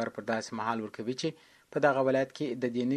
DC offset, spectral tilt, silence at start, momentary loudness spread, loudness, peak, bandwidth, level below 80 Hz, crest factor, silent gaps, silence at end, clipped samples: under 0.1%; -5.5 dB/octave; 0 s; 9 LU; -31 LUFS; -10 dBFS; 12.5 kHz; -74 dBFS; 20 dB; none; 0 s; under 0.1%